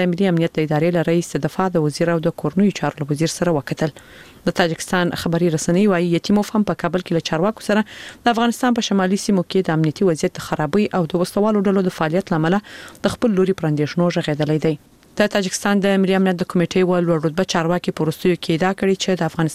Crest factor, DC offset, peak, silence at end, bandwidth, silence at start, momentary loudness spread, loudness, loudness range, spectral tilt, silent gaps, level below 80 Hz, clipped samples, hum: 16 dB; 0.2%; -2 dBFS; 0 s; 15.5 kHz; 0 s; 5 LU; -19 LUFS; 2 LU; -6 dB/octave; none; -50 dBFS; under 0.1%; none